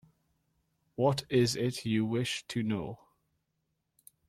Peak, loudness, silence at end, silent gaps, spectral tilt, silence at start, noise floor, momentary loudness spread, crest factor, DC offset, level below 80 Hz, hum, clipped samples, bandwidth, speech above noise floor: -14 dBFS; -31 LUFS; 1.35 s; none; -5.5 dB/octave; 1 s; -81 dBFS; 14 LU; 20 dB; under 0.1%; -66 dBFS; none; under 0.1%; 15 kHz; 51 dB